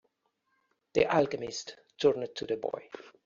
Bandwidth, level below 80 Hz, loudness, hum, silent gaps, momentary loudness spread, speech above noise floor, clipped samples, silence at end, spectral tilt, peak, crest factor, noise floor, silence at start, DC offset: 7.6 kHz; -66 dBFS; -31 LUFS; none; none; 15 LU; 47 dB; under 0.1%; 0.15 s; -3.5 dB/octave; -12 dBFS; 22 dB; -78 dBFS; 0.95 s; under 0.1%